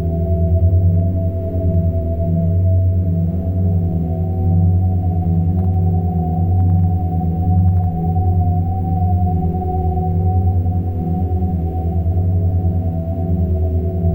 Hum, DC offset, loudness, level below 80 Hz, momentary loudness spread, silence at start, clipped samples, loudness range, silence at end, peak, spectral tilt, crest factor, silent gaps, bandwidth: none; under 0.1%; -17 LUFS; -30 dBFS; 5 LU; 0 s; under 0.1%; 2 LU; 0 s; -4 dBFS; -13.5 dB/octave; 10 dB; none; 1.1 kHz